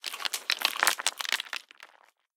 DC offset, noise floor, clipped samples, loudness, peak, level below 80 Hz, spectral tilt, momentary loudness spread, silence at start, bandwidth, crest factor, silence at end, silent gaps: under 0.1%; -62 dBFS; under 0.1%; -28 LUFS; -4 dBFS; under -90 dBFS; 3 dB/octave; 10 LU; 0.05 s; 17.5 kHz; 28 dB; 0.5 s; none